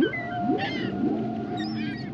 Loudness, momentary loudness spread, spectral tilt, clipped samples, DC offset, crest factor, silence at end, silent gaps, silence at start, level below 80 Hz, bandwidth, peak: -28 LUFS; 4 LU; -7.5 dB/octave; under 0.1%; under 0.1%; 16 dB; 0 s; none; 0 s; -60 dBFS; 8 kHz; -12 dBFS